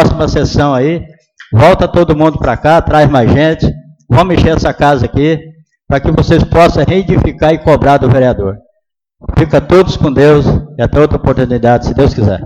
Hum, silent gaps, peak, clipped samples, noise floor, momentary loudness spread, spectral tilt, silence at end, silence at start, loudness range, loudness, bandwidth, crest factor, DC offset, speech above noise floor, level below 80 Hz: none; none; 0 dBFS; 0.2%; -64 dBFS; 8 LU; -7.5 dB/octave; 0 s; 0 s; 1 LU; -9 LUFS; 10.5 kHz; 8 dB; under 0.1%; 56 dB; -22 dBFS